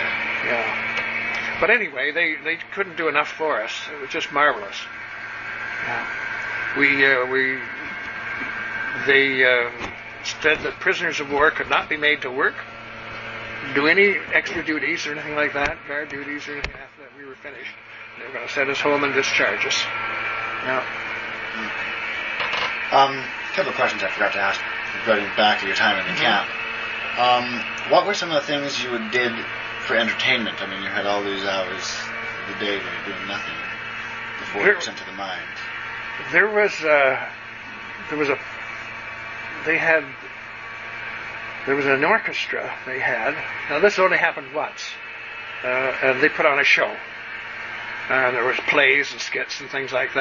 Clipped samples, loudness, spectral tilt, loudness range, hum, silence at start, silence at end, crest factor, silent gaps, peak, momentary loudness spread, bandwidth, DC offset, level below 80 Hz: under 0.1%; -21 LUFS; -3 dB/octave; 5 LU; none; 0 s; 0 s; 20 dB; none; -2 dBFS; 14 LU; 7.4 kHz; under 0.1%; -56 dBFS